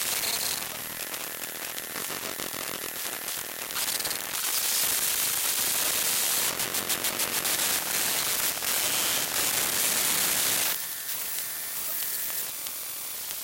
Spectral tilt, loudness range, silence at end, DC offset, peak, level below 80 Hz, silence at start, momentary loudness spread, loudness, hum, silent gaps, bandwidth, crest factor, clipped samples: 0.5 dB/octave; 7 LU; 0 s; under 0.1%; -8 dBFS; -64 dBFS; 0 s; 9 LU; -26 LUFS; none; none; 17 kHz; 20 dB; under 0.1%